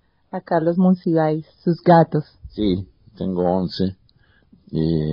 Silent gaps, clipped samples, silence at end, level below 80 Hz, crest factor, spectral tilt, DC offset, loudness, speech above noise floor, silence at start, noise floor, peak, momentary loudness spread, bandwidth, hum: none; under 0.1%; 0 s; -48 dBFS; 18 dB; -7 dB/octave; under 0.1%; -20 LUFS; 38 dB; 0.35 s; -57 dBFS; -2 dBFS; 15 LU; 5.4 kHz; none